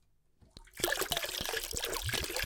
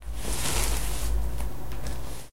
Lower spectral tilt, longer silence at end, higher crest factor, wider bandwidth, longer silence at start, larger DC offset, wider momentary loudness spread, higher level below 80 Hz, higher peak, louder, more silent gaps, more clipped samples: second, -1.5 dB/octave vs -3 dB/octave; about the same, 0 s vs 0 s; about the same, 24 dB vs 20 dB; first, 19 kHz vs 16 kHz; first, 0.55 s vs 0 s; second, under 0.1% vs 4%; second, 3 LU vs 10 LU; second, -52 dBFS vs -32 dBFS; about the same, -12 dBFS vs -10 dBFS; second, -34 LUFS vs -31 LUFS; neither; neither